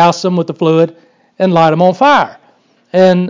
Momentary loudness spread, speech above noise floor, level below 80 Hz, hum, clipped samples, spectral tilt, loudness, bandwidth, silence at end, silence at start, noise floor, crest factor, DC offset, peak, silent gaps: 8 LU; 41 dB; -60 dBFS; none; under 0.1%; -6.5 dB/octave; -11 LUFS; 7.6 kHz; 0 s; 0 s; -51 dBFS; 10 dB; under 0.1%; 0 dBFS; none